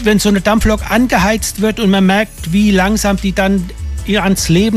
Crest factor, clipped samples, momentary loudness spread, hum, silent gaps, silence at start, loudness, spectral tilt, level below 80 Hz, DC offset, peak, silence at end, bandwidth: 12 dB; under 0.1%; 5 LU; none; none; 0 s; -13 LUFS; -5 dB/octave; -24 dBFS; under 0.1%; 0 dBFS; 0 s; 15 kHz